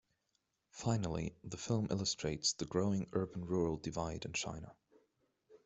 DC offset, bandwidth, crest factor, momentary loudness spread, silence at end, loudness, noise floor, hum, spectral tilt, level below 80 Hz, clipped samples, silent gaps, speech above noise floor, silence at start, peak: under 0.1%; 8.2 kHz; 18 dB; 9 LU; 0.1 s; -38 LUFS; -83 dBFS; none; -4.5 dB/octave; -62 dBFS; under 0.1%; none; 45 dB; 0.75 s; -20 dBFS